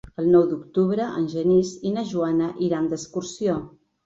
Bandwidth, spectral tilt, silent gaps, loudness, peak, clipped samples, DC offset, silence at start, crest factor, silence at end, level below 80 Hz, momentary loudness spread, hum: 7.8 kHz; -7 dB/octave; none; -23 LUFS; -6 dBFS; under 0.1%; under 0.1%; 0.2 s; 18 dB; 0.4 s; -56 dBFS; 8 LU; none